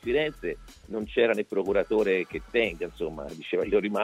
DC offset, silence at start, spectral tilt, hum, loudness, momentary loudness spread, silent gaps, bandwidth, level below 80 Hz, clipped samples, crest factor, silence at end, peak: under 0.1%; 0.05 s; -6 dB/octave; none; -28 LUFS; 11 LU; none; 13.5 kHz; -50 dBFS; under 0.1%; 16 dB; 0 s; -10 dBFS